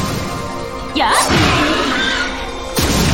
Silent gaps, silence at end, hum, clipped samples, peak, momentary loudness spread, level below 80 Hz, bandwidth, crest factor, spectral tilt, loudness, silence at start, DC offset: none; 0 s; none; under 0.1%; 0 dBFS; 12 LU; -28 dBFS; 17 kHz; 16 dB; -3.5 dB/octave; -16 LUFS; 0 s; under 0.1%